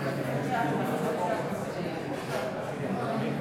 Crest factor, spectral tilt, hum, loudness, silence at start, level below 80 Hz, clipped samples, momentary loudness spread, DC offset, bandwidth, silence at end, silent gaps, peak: 14 dB; -6.5 dB/octave; none; -31 LUFS; 0 s; -66 dBFS; under 0.1%; 5 LU; under 0.1%; 16.5 kHz; 0 s; none; -16 dBFS